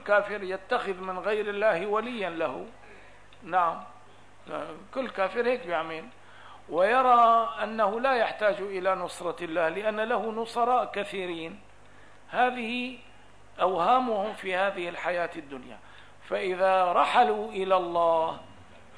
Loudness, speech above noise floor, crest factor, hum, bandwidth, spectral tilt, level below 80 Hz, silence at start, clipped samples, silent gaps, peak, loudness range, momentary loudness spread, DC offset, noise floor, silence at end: -27 LUFS; 28 dB; 18 dB; 50 Hz at -65 dBFS; 11 kHz; -4.5 dB/octave; -66 dBFS; 0 s; under 0.1%; none; -10 dBFS; 6 LU; 15 LU; 0.3%; -55 dBFS; 0.35 s